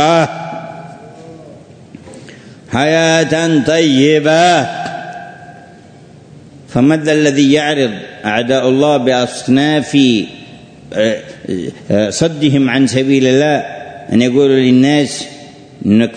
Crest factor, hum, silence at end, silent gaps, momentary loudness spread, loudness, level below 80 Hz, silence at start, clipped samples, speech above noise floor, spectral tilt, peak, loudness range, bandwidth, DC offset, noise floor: 14 dB; none; 0 s; none; 16 LU; -12 LUFS; -52 dBFS; 0 s; under 0.1%; 27 dB; -5 dB/octave; 0 dBFS; 3 LU; 9.6 kHz; under 0.1%; -38 dBFS